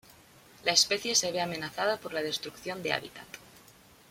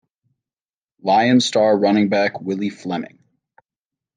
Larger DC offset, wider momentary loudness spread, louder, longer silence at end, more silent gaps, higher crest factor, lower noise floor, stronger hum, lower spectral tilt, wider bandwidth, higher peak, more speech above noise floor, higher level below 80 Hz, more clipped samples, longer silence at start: neither; first, 21 LU vs 13 LU; second, -29 LUFS vs -18 LUFS; second, 0.55 s vs 1.1 s; neither; first, 26 dB vs 16 dB; second, -57 dBFS vs under -90 dBFS; neither; second, -1 dB/octave vs -5 dB/octave; first, 16.5 kHz vs 9.6 kHz; about the same, -6 dBFS vs -4 dBFS; second, 26 dB vs over 73 dB; about the same, -70 dBFS vs -70 dBFS; neither; second, 0.65 s vs 1.05 s